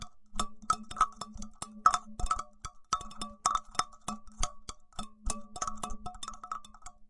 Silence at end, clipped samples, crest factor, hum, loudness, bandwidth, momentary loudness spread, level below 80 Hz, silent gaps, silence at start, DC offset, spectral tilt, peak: 0.05 s; under 0.1%; 26 dB; none; -35 LUFS; 11.5 kHz; 16 LU; -46 dBFS; none; 0 s; under 0.1%; -2 dB/octave; -10 dBFS